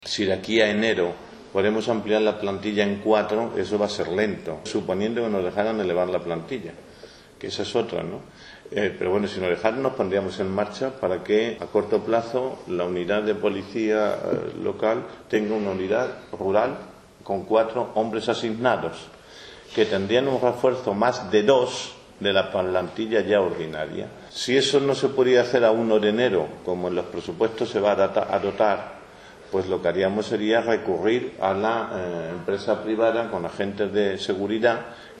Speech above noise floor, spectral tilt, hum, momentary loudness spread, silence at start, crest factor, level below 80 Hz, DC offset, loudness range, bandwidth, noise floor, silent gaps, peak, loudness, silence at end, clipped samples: 23 dB; -5 dB/octave; none; 10 LU; 0 s; 22 dB; -60 dBFS; under 0.1%; 5 LU; 10.5 kHz; -46 dBFS; none; -2 dBFS; -24 LUFS; 0 s; under 0.1%